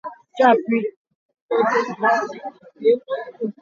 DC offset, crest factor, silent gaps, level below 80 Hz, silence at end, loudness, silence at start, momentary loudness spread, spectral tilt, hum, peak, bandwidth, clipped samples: under 0.1%; 18 dB; 0.96-1.05 s, 1.15-1.29 s, 1.42-1.49 s; -76 dBFS; 0.1 s; -20 LUFS; 0.05 s; 15 LU; -5.5 dB/octave; none; -2 dBFS; 7.2 kHz; under 0.1%